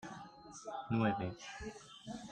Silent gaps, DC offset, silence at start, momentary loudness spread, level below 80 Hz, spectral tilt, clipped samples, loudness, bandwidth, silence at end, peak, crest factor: none; under 0.1%; 0 s; 17 LU; -64 dBFS; -6 dB/octave; under 0.1%; -41 LUFS; 9.8 kHz; 0 s; -20 dBFS; 20 dB